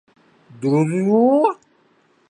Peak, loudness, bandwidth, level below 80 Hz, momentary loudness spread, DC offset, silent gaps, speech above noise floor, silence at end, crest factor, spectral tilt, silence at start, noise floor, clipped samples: -4 dBFS; -18 LUFS; 10.5 kHz; -70 dBFS; 10 LU; under 0.1%; none; 43 dB; 0.75 s; 16 dB; -8.5 dB/octave; 0.6 s; -59 dBFS; under 0.1%